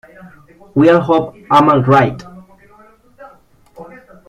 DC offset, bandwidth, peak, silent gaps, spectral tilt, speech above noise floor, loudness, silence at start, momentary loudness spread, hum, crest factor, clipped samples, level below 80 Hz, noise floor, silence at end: under 0.1%; 11 kHz; 0 dBFS; none; -8 dB/octave; 34 dB; -12 LUFS; 0.25 s; 9 LU; none; 16 dB; under 0.1%; -50 dBFS; -47 dBFS; 0.45 s